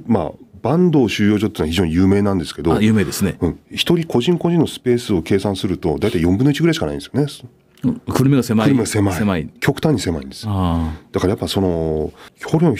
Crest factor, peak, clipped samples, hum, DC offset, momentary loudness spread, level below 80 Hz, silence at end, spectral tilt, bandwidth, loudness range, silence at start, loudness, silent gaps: 14 dB; -2 dBFS; under 0.1%; none; under 0.1%; 8 LU; -38 dBFS; 0 s; -6.5 dB/octave; 16 kHz; 2 LU; 0 s; -18 LUFS; none